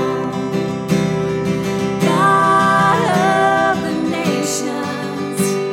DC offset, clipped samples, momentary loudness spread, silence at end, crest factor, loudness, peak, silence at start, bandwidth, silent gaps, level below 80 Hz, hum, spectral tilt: under 0.1%; under 0.1%; 9 LU; 0 s; 14 dB; -16 LUFS; -2 dBFS; 0 s; 16.5 kHz; none; -54 dBFS; none; -5 dB/octave